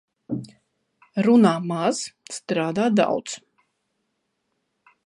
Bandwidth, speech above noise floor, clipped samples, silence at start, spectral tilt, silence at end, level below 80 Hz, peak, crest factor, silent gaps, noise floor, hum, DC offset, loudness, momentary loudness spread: 11.5 kHz; 54 dB; under 0.1%; 0.3 s; -5.5 dB/octave; 1.65 s; -72 dBFS; -4 dBFS; 20 dB; none; -75 dBFS; none; under 0.1%; -22 LUFS; 16 LU